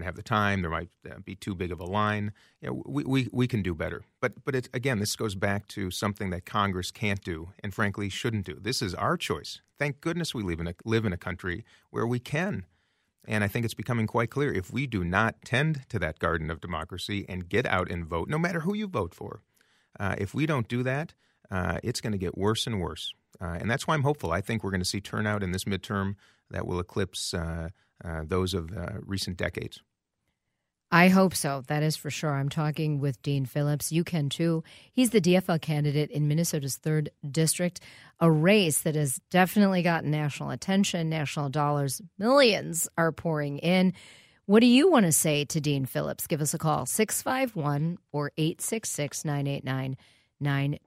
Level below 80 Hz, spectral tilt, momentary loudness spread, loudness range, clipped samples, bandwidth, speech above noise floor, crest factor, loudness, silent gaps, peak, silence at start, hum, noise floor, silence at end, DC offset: -54 dBFS; -5 dB/octave; 12 LU; 7 LU; under 0.1%; 16 kHz; 54 dB; 22 dB; -28 LUFS; none; -6 dBFS; 0 s; none; -82 dBFS; 0.1 s; under 0.1%